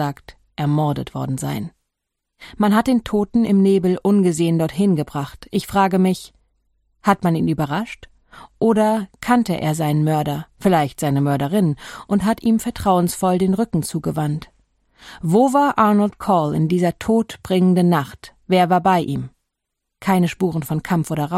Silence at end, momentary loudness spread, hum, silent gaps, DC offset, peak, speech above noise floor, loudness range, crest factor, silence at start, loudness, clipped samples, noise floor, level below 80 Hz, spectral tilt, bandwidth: 0 s; 10 LU; none; none; under 0.1%; -2 dBFS; 61 dB; 3 LU; 18 dB; 0 s; -19 LUFS; under 0.1%; -79 dBFS; -48 dBFS; -7 dB/octave; 15.5 kHz